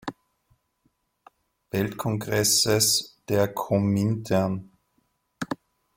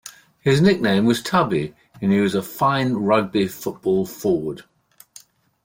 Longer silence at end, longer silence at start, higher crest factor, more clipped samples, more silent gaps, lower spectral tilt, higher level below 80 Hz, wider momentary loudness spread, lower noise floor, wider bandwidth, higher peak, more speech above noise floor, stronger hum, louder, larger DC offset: second, 0.4 s vs 1.05 s; about the same, 0.05 s vs 0.05 s; about the same, 18 dB vs 16 dB; neither; neither; second, -4 dB/octave vs -6 dB/octave; about the same, -58 dBFS vs -56 dBFS; first, 15 LU vs 10 LU; first, -71 dBFS vs -49 dBFS; about the same, 17 kHz vs 16.5 kHz; second, -10 dBFS vs -4 dBFS; first, 48 dB vs 30 dB; neither; second, -24 LUFS vs -20 LUFS; neither